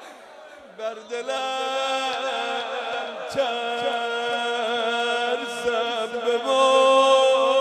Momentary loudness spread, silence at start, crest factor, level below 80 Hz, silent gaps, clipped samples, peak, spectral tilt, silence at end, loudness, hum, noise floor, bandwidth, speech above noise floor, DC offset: 13 LU; 0 s; 18 dB; -70 dBFS; none; under 0.1%; -6 dBFS; -1.5 dB/octave; 0 s; -23 LUFS; none; -44 dBFS; 12 kHz; 18 dB; under 0.1%